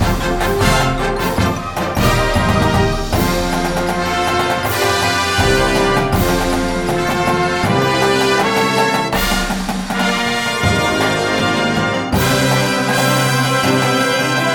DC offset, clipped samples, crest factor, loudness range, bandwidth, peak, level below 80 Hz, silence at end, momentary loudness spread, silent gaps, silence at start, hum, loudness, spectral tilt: 0.2%; under 0.1%; 14 dB; 1 LU; over 20 kHz; 0 dBFS; -28 dBFS; 0 s; 4 LU; none; 0 s; none; -15 LUFS; -4.5 dB/octave